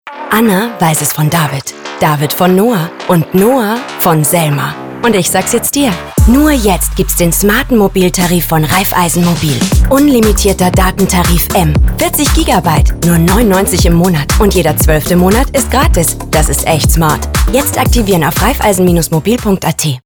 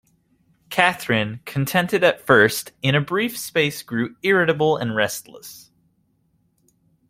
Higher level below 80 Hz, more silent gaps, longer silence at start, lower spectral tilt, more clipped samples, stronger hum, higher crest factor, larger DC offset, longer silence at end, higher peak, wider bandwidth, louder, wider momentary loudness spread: first, -18 dBFS vs -58 dBFS; neither; second, 0.05 s vs 0.7 s; about the same, -5 dB/octave vs -4.5 dB/octave; neither; neither; second, 10 dB vs 20 dB; neither; second, 0.05 s vs 1.5 s; about the same, 0 dBFS vs -2 dBFS; first, over 20 kHz vs 16.5 kHz; first, -10 LUFS vs -20 LUFS; second, 4 LU vs 11 LU